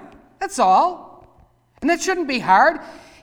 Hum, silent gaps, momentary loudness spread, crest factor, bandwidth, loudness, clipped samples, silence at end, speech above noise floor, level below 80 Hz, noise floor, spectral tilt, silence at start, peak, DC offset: none; none; 16 LU; 18 dB; 17 kHz; -18 LUFS; under 0.1%; 0.25 s; 37 dB; -54 dBFS; -55 dBFS; -3 dB/octave; 0 s; -2 dBFS; under 0.1%